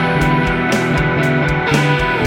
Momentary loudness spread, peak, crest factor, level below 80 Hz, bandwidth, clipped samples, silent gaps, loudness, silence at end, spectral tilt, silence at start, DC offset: 1 LU; -2 dBFS; 14 dB; -30 dBFS; 16.5 kHz; under 0.1%; none; -15 LUFS; 0 s; -6 dB/octave; 0 s; under 0.1%